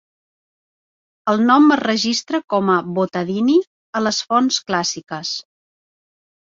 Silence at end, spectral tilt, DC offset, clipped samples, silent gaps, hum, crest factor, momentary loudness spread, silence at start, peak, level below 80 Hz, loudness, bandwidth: 1.15 s; -4 dB/octave; under 0.1%; under 0.1%; 3.67-3.93 s; none; 18 dB; 13 LU; 1.25 s; -2 dBFS; -64 dBFS; -18 LUFS; 7.8 kHz